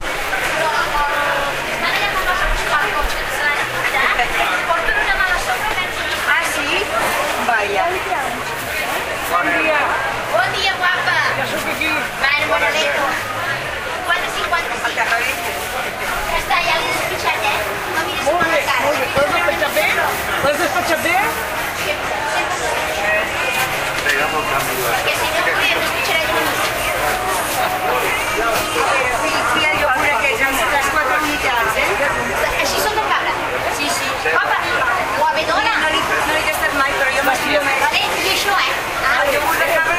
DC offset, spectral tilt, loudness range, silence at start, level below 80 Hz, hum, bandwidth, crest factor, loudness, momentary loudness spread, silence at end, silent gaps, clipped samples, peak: under 0.1%; -2 dB/octave; 2 LU; 0 s; -36 dBFS; none; 16 kHz; 16 dB; -16 LUFS; 5 LU; 0 s; none; under 0.1%; -2 dBFS